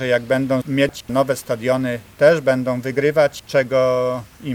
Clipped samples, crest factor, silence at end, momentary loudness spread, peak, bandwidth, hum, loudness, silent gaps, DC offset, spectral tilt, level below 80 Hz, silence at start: under 0.1%; 16 dB; 0 s; 6 LU; -2 dBFS; 17.5 kHz; none; -19 LUFS; none; under 0.1%; -6 dB/octave; -54 dBFS; 0 s